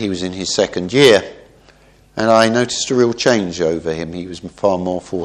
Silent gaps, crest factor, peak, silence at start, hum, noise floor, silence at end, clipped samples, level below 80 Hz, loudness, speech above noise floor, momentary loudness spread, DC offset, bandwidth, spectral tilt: none; 16 dB; 0 dBFS; 0 s; none; -48 dBFS; 0 s; under 0.1%; -48 dBFS; -16 LUFS; 33 dB; 15 LU; under 0.1%; 14 kHz; -4 dB/octave